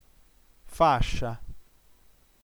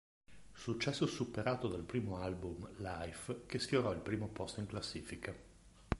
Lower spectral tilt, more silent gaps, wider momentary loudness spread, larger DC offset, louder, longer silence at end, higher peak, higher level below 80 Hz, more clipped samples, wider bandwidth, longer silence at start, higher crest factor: about the same, -5.5 dB/octave vs -5.5 dB/octave; neither; first, 21 LU vs 10 LU; neither; first, -26 LUFS vs -41 LUFS; first, 0.9 s vs 0 s; first, -8 dBFS vs -16 dBFS; first, -38 dBFS vs -56 dBFS; neither; first, over 20 kHz vs 11.5 kHz; first, 0.65 s vs 0.3 s; second, 20 dB vs 26 dB